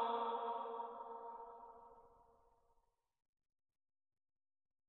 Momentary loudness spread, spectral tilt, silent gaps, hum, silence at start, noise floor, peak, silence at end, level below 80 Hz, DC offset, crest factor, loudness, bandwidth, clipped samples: 21 LU; -1 dB/octave; none; none; 0 s; -81 dBFS; -30 dBFS; 2.6 s; -84 dBFS; under 0.1%; 20 dB; -46 LUFS; 4.2 kHz; under 0.1%